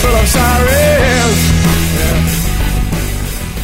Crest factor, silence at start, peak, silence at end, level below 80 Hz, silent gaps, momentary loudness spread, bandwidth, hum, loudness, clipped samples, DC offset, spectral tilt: 10 dB; 0 s; 0 dBFS; 0 s; -16 dBFS; none; 8 LU; 16.5 kHz; none; -12 LUFS; under 0.1%; 1%; -4.5 dB/octave